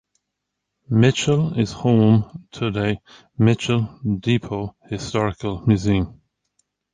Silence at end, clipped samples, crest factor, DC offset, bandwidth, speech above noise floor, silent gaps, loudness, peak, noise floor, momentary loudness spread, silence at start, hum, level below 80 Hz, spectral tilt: 0.8 s; under 0.1%; 18 dB; under 0.1%; 9.4 kHz; 60 dB; none; -21 LUFS; -4 dBFS; -80 dBFS; 13 LU; 0.9 s; none; -44 dBFS; -6.5 dB/octave